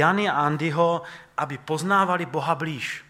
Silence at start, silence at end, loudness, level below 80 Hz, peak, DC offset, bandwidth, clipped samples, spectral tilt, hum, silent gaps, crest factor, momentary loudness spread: 0 s; 0.1 s; -24 LUFS; -68 dBFS; -4 dBFS; under 0.1%; 15 kHz; under 0.1%; -5.5 dB/octave; none; none; 20 dB; 9 LU